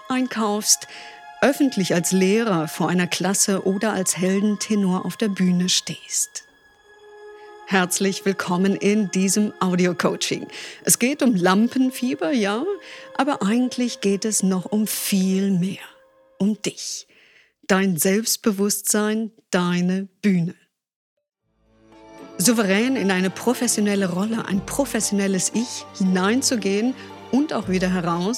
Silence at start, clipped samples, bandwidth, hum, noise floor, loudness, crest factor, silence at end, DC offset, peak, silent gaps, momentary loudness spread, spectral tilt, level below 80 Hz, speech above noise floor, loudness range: 0.05 s; under 0.1%; 16.5 kHz; none; -61 dBFS; -21 LUFS; 18 dB; 0 s; under 0.1%; -4 dBFS; 20.96-21.17 s; 8 LU; -4 dB/octave; -58 dBFS; 40 dB; 3 LU